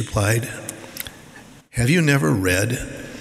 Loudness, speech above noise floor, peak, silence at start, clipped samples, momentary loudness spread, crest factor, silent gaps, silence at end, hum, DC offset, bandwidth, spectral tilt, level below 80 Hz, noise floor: -20 LUFS; 25 dB; -4 dBFS; 0 s; under 0.1%; 16 LU; 18 dB; none; 0 s; none; under 0.1%; 16 kHz; -5 dB/octave; -42 dBFS; -44 dBFS